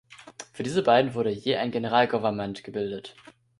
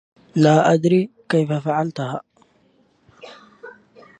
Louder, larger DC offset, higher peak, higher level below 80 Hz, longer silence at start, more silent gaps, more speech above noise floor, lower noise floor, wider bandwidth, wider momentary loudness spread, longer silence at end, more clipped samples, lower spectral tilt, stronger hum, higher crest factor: second, -26 LUFS vs -19 LUFS; neither; second, -6 dBFS vs -2 dBFS; about the same, -64 dBFS vs -66 dBFS; second, 0.1 s vs 0.35 s; neither; second, 21 dB vs 42 dB; second, -46 dBFS vs -59 dBFS; first, 11.5 kHz vs 9.8 kHz; first, 21 LU vs 13 LU; about the same, 0.5 s vs 0.5 s; neither; second, -5.5 dB/octave vs -7 dB/octave; neither; about the same, 20 dB vs 18 dB